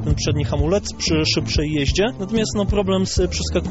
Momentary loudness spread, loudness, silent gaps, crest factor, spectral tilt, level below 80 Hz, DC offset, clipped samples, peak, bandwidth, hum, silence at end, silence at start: 2 LU; -20 LUFS; none; 14 dB; -5 dB/octave; -28 dBFS; under 0.1%; under 0.1%; -6 dBFS; 8.2 kHz; none; 0 s; 0 s